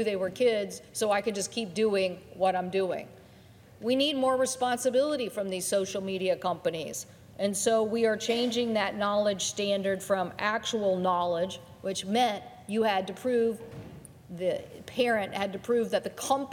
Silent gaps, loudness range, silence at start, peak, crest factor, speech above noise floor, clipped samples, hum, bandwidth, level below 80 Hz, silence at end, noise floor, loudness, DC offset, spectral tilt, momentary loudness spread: none; 2 LU; 0 s; -12 dBFS; 18 dB; 25 dB; under 0.1%; none; 17.5 kHz; -68 dBFS; 0 s; -54 dBFS; -29 LUFS; under 0.1%; -3.5 dB/octave; 10 LU